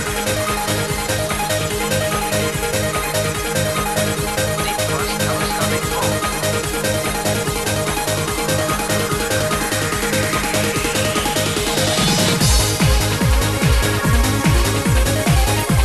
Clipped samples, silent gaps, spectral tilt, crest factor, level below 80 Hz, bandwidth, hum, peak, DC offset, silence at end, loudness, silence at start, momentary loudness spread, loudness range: under 0.1%; none; -4 dB/octave; 14 dB; -26 dBFS; 13 kHz; none; -4 dBFS; 0.4%; 0 s; -18 LUFS; 0 s; 4 LU; 3 LU